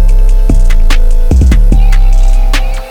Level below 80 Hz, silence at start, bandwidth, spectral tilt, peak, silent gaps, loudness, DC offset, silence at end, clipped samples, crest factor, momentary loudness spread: -4 dBFS; 0 s; 9.2 kHz; -6 dB/octave; 0 dBFS; none; -11 LUFS; under 0.1%; 0 s; under 0.1%; 4 dB; 4 LU